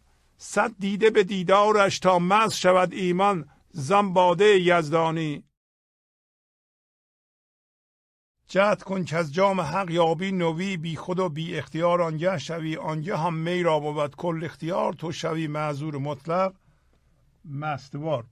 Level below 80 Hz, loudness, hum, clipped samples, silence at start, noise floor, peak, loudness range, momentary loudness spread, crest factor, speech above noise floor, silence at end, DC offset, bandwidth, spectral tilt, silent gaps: -62 dBFS; -24 LUFS; none; under 0.1%; 0.4 s; -62 dBFS; -6 dBFS; 9 LU; 11 LU; 20 dB; 39 dB; 0.05 s; under 0.1%; 13.5 kHz; -5.5 dB/octave; 5.57-8.35 s